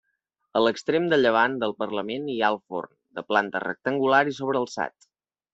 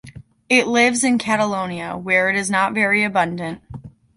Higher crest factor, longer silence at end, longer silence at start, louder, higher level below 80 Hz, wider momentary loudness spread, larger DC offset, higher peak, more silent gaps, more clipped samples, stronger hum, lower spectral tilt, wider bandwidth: about the same, 20 dB vs 18 dB; first, 0.65 s vs 0.3 s; first, 0.55 s vs 0.05 s; second, -25 LUFS vs -18 LUFS; second, -70 dBFS vs -54 dBFS; about the same, 12 LU vs 14 LU; neither; second, -6 dBFS vs -2 dBFS; neither; neither; neither; first, -5 dB/octave vs -3.5 dB/octave; second, 8 kHz vs 11.5 kHz